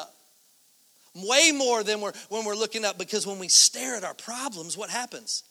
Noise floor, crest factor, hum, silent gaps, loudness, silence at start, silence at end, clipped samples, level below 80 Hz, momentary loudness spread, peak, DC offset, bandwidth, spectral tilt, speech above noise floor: -61 dBFS; 24 dB; none; none; -24 LUFS; 0 s; 0.1 s; under 0.1%; -80 dBFS; 16 LU; -4 dBFS; under 0.1%; over 20 kHz; 0 dB/octave; 35 dB